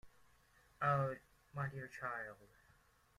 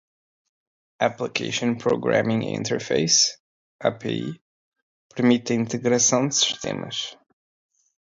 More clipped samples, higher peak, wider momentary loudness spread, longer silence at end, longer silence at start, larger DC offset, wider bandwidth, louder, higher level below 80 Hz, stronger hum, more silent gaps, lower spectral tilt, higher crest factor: neither; second, -24 dBFS vs -6 dBFS; first, 16 LU vs 11 LU; second, 0.7 s vs 0.9 s; second, 0.05 s vs 1 s; neither; first, 13.5 kHz vs 7.8 kHz; second, -42 LUFS vs -22 LUFS; second, -74 dBFS vs -64 dBFS; neither; second, none vs 3.40-3.79 s, 4.41-4.72 s, 4.82-5.10 s; first, -7.5 dB/octave vs -3 dB/octave; about the same, 20 dB vs 20 dB